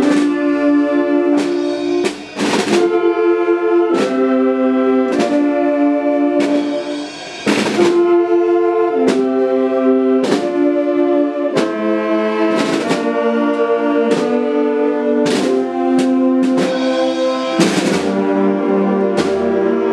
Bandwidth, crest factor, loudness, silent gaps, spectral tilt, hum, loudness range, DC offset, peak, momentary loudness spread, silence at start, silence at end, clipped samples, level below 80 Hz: 12 kHz; 14 dB; -15 LUFS; none; -5.5 dB/octave; none; 1 LU; under 0.1%; 0 dBFS; 3 LU; 0 s; 0 s; under 0.1%; -58 dBFS